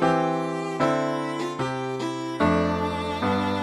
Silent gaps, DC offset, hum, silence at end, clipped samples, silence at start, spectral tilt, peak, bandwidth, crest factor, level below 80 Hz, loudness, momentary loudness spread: none; under 0.1%; none; 0 s; under 0.1%; 0 s; -6 dB/octave; -8 dBFS; 13 kHz; 16 dB; -50 dBFS; -25 LUFS; 7 LU